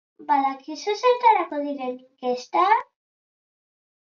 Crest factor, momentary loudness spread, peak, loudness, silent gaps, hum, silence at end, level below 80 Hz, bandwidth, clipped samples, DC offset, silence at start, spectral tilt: 18 dB; 12 LU; -6 dBFS; -23 LUFS; none; none; 1.3 s; -88 dBFS; 7.2 kHz; under 0.1%; under 0.1%; 0.2 s; -2.5 dB/octave